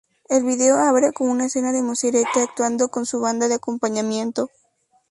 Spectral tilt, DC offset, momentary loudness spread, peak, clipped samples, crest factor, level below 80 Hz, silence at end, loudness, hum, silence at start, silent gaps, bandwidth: -3 dB/octave; under 0.1%; 7 LU; -4 dBFS; under 0.1%; 16 dB; -68 dBFS; 0.65 s; -20 LUFS; none; 0.3 s; none; 11.5 kHz